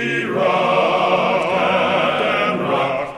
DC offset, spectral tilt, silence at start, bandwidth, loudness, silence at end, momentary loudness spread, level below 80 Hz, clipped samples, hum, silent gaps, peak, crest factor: under 0.1%; -5.5 dB/octave; 0 s; 12.5 kHz; -17 LUFS; 0 s; 3 LU; -58 dBFS; under 0.1%; none; none; -4 dBFS; 14 dB